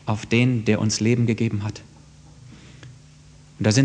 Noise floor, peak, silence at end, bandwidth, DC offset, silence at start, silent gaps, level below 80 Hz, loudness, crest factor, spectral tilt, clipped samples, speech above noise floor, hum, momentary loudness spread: -48 dBFS; -4 dBFS; 0 s; 9.8 kHz; under 0.1%; 0.05 s; none; -54 dBFS; -22 LUFS; 18 dB; -5.5 dB/octave; under 0.1%; 27 dB; 50 Hz at -45 dBFS; 21 LU